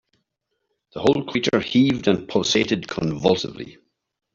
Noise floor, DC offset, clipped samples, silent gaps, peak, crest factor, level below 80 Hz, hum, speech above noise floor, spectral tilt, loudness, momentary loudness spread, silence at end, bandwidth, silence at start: -76 dBFS; under 0.1%; under 0.1%; none; -4 dBFS; 20 dB; -54 dBFS; none; 56 dB; -5 dB/octave; -21 LUFS; 13 LU; 0.6 s; 7.6 kHz; 0.95 s